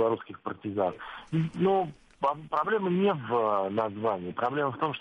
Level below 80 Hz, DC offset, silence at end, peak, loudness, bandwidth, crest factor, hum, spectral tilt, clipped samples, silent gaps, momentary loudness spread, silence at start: -66 dBFS; under 0.1%; 0 s; -14 dBFS; -29 LUFS; 8.8 kHz; 14 dB; none; -8.5 dB/octave; under 0.1%; none; 8 LU; 0 s